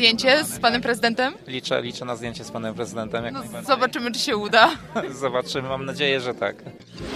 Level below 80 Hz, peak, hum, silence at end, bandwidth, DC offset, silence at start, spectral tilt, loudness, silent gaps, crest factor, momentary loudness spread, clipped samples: -54 dBFS; 0 dBFS; none; 0 s; 15 kHz; under 0.1%; 0 s; -3.5 dB/octave; -23 LUFS; none; 22 dB; 14 LU; under 0.1%